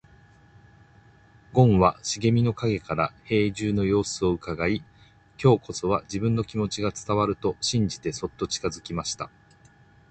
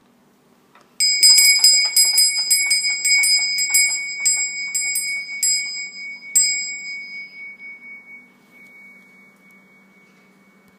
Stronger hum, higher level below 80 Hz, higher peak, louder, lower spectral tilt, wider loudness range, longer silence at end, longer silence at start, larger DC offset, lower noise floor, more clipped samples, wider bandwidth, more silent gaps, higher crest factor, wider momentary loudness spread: neither; first, -48 dBFS vs -82 dBFS; second, -4 dBFS vs 0 dBFS; second, -25 LUFS vs -14 LUFS; first, -5.5 dB/octave vs 5 dB/octave; second, 4 LU vs 11 LU; second, 0.85 s vs 1.9 s; first, 1.55 s vs 1 s; neither; about the same, -56 dBFS vs -56 dBFS; neither; second, 9 kHz vs 16 kHz; neither; about the same, 20 dB vs 20 dB; second, 9 LU vs 22 LU